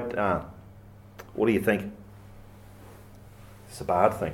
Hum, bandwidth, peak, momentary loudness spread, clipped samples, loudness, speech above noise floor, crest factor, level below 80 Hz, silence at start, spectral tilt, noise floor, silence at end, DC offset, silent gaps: none; 17.5 kHz; -6 dBFS; 26 LU; under 0.1%; -26 LUFS; 23 dB; 24 dB; -54 dBFS; 0 s; -6.5 dB/octave; -49 dBFS; 0 s; under 0.1%; none